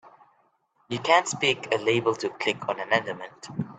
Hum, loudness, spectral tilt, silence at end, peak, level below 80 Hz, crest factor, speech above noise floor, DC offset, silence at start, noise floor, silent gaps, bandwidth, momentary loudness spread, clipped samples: none; -25 LUFS; -3.5 dB/octave; 0.05 s; -6 dBFS; -70 dBFS; 22 dB; 41 dB; under 0.1%; 0.05 s; -67 dBFS; none; 9.4 kHz; 14 LU; under 0.1%